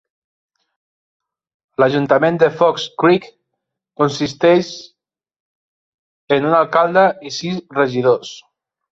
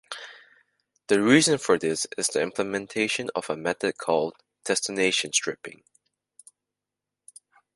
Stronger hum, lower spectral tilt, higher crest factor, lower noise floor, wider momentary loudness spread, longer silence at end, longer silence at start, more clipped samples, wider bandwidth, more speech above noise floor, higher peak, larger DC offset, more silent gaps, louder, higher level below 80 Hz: second, none vs 50 Hz at -60 dBFS; first, -5.5 dB/octave vs -3 dB/octave; second, 16 dB vs 24 dB; second, -78 dBFS vs -87 dBFS; second, 10 LU vs 19 LU; second, 0.5 s vs 2.05 s; first, 1.8 s vs 0.1 s; neither; second, 7.8 kHz vs 11.5 kHz; about the same, 62 dB vs 63 dB; about the same, -2 dBFS vs -4 dBFS; neither; first, 5.40-6.28 s vs none; first, -16 LUFS vs -24 LUFS; first, -60 dBFS vs -68 dBFS